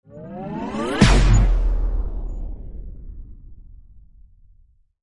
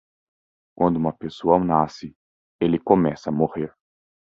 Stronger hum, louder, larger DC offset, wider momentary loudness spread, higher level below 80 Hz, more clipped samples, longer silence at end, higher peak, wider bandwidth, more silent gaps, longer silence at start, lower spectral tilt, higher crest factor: neither; about the same, -21 LUFS vs -22 LUFS; neither; first, 24 LU vs 13 LU; first, -22 dBFS vs -52 dBFS; neither; first, 1.05 s vs 0.65 s; about the same, -2 dBFS vs -2 dBFS; first, 11 kHz vs 7.4 kHz; second, none vs 2.16-2.59 s; second, 0.1 s vs 0.8 s; second, -5.5 dB/octave vs -8.5 dB/octave; about the same, 20 dB vs 22 dB